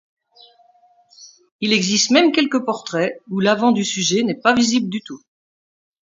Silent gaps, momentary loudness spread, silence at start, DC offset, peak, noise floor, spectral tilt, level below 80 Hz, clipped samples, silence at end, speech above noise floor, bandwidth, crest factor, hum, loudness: 1.52-1.59 s; 11 LU; 1.2 s; under 0.1%; 0 dBFS; -55 dBFS; -3.5 dB/octave; -64 dBFS; under 0.1%; 0.95 s; 37 dB; 7.8 kHz; 20 dB; none; -17 LUFS